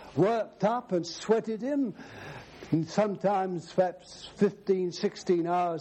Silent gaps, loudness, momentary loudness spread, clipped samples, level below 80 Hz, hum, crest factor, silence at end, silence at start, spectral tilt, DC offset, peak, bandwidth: none; -29 LUFS; 17 LU; under 0.1%; -66 dBFS; none; 18 dB; 0 s; 0 s; -6.5 dB/octave; under 0.1%; -12 dBFS; 9 kHz